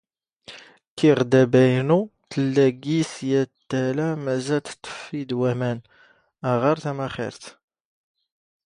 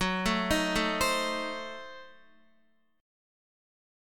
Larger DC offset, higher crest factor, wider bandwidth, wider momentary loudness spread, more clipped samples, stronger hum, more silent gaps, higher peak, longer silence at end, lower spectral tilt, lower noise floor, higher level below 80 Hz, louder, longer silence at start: neither; about the same, 18 dB vs 20 dB; second, 11 kHz vs 17.5 kHz; about the same, 17 LU vs 17 LU; neither; neither; first, 0.88-0.97 s vs none; first, -4 dBFS vs -14 dBFS; first, 1.15 s vs 1 s; first, -7 dB/octave vs -3.5 dB/octave; second, -48 dBFS vs -70 dBFS; second, -62 dBFS vs -48 dBFS; first, -22 LUFS vs -29 LUFS; first, 0.5 s vs 0 s